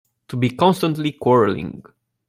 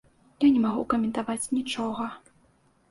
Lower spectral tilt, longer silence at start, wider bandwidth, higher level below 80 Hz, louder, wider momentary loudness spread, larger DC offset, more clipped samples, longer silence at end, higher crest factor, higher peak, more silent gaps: first, -7 dB/octave vs -4.5 dB/octave; about the same, 0.3 s vs 0.4 s; first, 16 kHz vs 11.5 kHz; about the same, -56 dBFS vs -60 dBFS; first, -19 LUFS vs -26 LUFS; first, 13 LU vs 10 LU; neither; neither; second, 0.5 s vs 0.7 s; about the same, 18 dB vs 16 dB; first, -2 dBFS vs -12 dBFS; neither